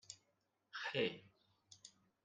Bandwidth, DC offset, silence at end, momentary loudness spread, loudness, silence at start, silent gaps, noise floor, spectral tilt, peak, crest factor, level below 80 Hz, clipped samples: 9.6 kHz; under 0.1%; 0.35 s; 21 LU; -43 LUFS; 0.1 s; none; -83 dBFS; -3.5 dB/octave; -26 dBFS; 24 dB; -88 dBFS; under 0.1%